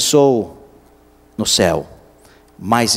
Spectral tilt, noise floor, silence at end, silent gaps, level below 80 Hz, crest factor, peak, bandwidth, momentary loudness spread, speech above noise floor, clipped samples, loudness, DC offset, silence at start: -3.5 dB/octave; -49 dBFS; 0 s; none; -46 dBFS; 18 dB; 0 dBFS; 16 kHz; 20 LU; 34 dB; under 0.1%; -16 LUFS; under 0.1%; 0 s